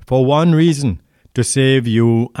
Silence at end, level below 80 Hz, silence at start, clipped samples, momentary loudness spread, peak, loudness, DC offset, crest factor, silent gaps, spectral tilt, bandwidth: 0 s; -44 dBFS; 0.1 s; under 0.1%; 9 LU; -4 dBFS; -14 LUFS; under 0.1%; 10 dB; none; -6 dB/octave; 13 kHz